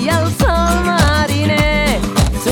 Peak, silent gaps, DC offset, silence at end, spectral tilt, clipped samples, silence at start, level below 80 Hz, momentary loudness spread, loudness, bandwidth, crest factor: 0 dBFS; none; under 0.1%; 0 s; -5 dB/octave; under 0.1%; 0 s; -20 dBFS; 3 LU; -14 LUFS; 18 kHz; 12 dB